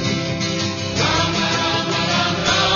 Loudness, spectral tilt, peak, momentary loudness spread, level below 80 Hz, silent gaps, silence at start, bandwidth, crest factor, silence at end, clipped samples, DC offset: -18 LUFS; -3.5 dB/octave; -4 dBFS; 4 LU; -42 dBFS; none; 0 s; 7.4 kHz; 16 dB; 0 s; under 0.1%; under 0.1%